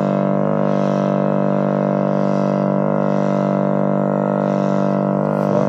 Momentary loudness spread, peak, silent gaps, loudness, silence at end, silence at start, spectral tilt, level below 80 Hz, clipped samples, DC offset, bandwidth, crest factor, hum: 0 LU; -4 dBFS; none; -18 LUFS; 0 s; 0 s; -9.5 dB/octave; -60 dBFS; under 0.1%; under 0.1%; 7.2 kHz; 14 dB; 50 Hz at -35 dBFS